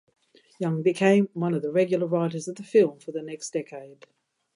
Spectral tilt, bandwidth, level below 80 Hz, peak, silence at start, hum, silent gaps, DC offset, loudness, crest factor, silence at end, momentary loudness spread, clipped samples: -6.5 dB/octave; 11 kHz; -78 dBFS; -8 dBFS; 0.6 s; none; none; under 0.1%; -25 LUFS; 18 dB; 0.6 s; 14 LU; under 0.1%